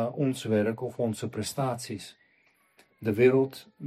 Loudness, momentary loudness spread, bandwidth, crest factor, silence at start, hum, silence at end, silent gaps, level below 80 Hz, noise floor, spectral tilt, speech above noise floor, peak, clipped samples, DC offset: -28 LUFS; 14 LU; 15 kHz; 20 dB; 0 s; none; 0 s; none; -68 dBFS; -67 dBFS; -6 dB/octave; 39 dB; -8 dBFS; under 0.1%; under 0.1%